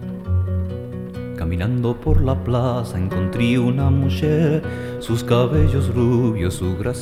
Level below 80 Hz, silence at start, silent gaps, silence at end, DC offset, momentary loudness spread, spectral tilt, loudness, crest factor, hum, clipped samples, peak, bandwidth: -30 dBFS; 0 s; none; 0 s; 0.3%; 10 LU; -7.5 dB/octave; -20 LUFS; 14 dB; none; under 0.1%; -4 dBFS; 14.5 kHz